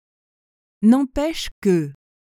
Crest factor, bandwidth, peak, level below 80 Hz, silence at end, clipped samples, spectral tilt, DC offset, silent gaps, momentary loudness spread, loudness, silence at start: 16 dB; 15.5 kHz; -6 dBFS; -44 dBFS; 0.35 s; under 0.1%; -6.5 dB/octave; under 0.1%; 1.51-1.62 s; 8 LU; -20 LUFS; 0.8 s